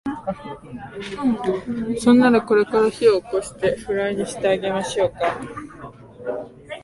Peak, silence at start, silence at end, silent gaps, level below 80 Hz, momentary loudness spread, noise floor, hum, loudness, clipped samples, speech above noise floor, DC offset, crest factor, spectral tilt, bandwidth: -2 dBFS; 0.05 s; 0.05 s; none; -52 dBFS; 19 LU; -40 dBFS; none; -20 LUFS; under 0.1%; 20 dB; under 0.1%; 18 dB; -5.5 dB/octave; 11.5 kHz